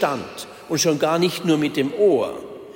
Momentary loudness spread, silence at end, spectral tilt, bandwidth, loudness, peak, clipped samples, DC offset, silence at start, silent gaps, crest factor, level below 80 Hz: 14 LU; 0.05 s; -4.5 dB/octave; 16.5 kHz; -20 LUFS; -6 dBFS; under 0.1%; under 0.1%; 0 s; none; 14 dB; -64 dBFS